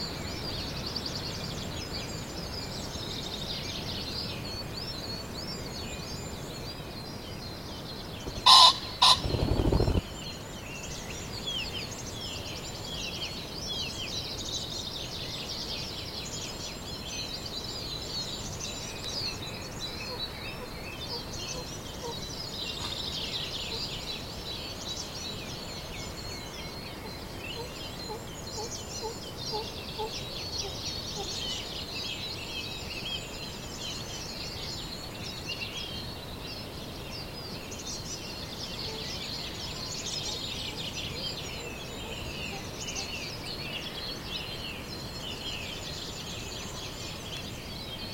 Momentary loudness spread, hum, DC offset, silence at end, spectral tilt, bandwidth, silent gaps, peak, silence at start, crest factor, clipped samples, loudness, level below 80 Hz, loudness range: 6 LU; none; under 0.1%; 0 s; -3 dB/octave; 16.5 kHz; none; -2 dBFS; 0 s; 32 dB; under 0.1%; -32 LUFS; -46 dBFS; 14 LU